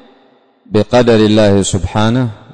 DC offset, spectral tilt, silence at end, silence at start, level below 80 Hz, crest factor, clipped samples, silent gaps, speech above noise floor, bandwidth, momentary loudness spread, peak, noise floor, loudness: under 0.1%; -6 dB/octave; 0 s; 0.7 s; -34 dBFS; 12 dB; under 0.1%; none; 39 dB; 9.6 kHz; 8 LU; -2 dBFS; -49 dBFS; -11 LUFS